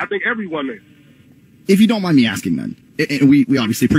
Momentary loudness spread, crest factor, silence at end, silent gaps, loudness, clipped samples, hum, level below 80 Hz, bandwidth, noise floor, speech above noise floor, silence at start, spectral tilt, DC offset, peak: 15 LU; 14 dB; 0 s; none; -16 LUFS; under 0.1%; none; -50 dBFS; 16 kHz; -48 dBFS; 33 dB; 0 s; -5.5 dB/octave; under 0.1%; -2 dBFS